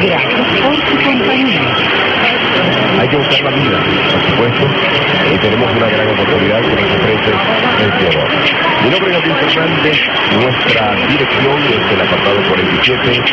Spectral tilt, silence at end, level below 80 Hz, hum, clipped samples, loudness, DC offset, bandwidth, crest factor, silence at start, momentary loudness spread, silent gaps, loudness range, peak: -6 dB/octave; 0 s; -40 dBFS; none; under 0.1%; -11 LUFS; under 0.1%; 8 kHz; 12 dB; 0 s; 1 LU; none; 0 LU; 0 dBFS